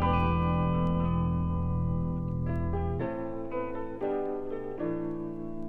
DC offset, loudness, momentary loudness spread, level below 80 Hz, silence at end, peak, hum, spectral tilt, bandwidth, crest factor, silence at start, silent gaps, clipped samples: under 0.1%; -31 LUFS; 8 LU; -40 dBFS; 0 s; -14 dBFS; none; -10.5 dB/octave; 4.3 kHz; 16 dB; 0 s; none; under 0.1%